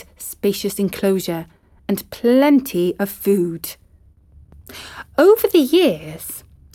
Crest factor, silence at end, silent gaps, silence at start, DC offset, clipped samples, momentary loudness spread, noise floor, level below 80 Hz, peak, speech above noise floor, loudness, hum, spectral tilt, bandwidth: 18 dB; 0.35 s; none; 0.2 s; under 0.1%; under 0.1%; 19 LU; -51 dBFS; -52 dBFS; -2 dBFS; 33 dB; -18 LUFS; none; -5.5 dB/octave; 18 kHz